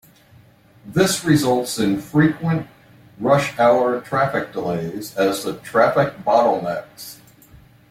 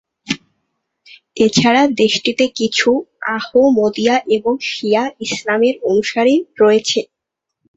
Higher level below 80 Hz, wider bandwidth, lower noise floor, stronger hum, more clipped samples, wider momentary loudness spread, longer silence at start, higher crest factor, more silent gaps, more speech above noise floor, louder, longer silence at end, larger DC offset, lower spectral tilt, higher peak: about the same, -54 dBFS vs -56 dBFS; first, 16.5 kHz vs 8 kHz; second, -50 dBFS vs -78 dBFS; neither; neither; about the same, 11 LU vs 10 LU; first, 0.85 s vs 0.3 s; about the same, 18 dB vs 14 dB; neither; second, 32 dB vs 64 dB; second, -19 LUFS vs -15 LUFS; about the same, 0.75 s vs 0.7 s; neither; first, -5.5 dB/octave vs -4 dB/octave; about the same, -2 dBFS vs 0 dBFS